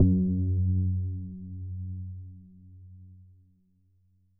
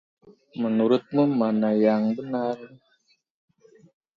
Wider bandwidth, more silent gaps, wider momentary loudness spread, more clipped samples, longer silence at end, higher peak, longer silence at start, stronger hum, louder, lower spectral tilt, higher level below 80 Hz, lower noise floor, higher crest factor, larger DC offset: second, 0.8 kHz vs 5.6 kHz; neither; first, 25 LU vs 9 LU; neither; second, 1.15 s vs 1.5 s; about the same, -8 dBFS vs -8 dBFS; second, 0 s vs 0.55 s; neither; second, -30 LUFS vs -23 LUFS; first, -18.5 dB/octave vs -9 dB/octave; first, -48 dBFS vs -72 dBFS; about the same, -66 dBFS vs -67 dBFS; about the same, 20 dB vs 18 dB; neither